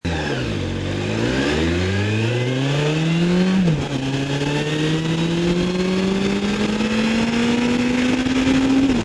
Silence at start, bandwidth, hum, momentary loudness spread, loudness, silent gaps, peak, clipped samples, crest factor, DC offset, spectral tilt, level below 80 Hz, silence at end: 0.05 s; 11 kHz; none; 5 LU; -19 LUFS; none; -6 dBFS; under 0.1%; 12 dB; under 0.1%; -6 dB/octave; -38 dBFS; 0 s